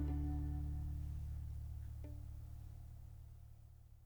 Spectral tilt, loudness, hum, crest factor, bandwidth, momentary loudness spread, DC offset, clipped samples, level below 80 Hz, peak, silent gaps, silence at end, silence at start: -9 dB/octave; -47 LUFS; none; 14 dB; over 20 kHz; 17 LU; under 0.1%; under 0.1%; -48 dBFS; -30 dBFS; none; 0 s; 0 s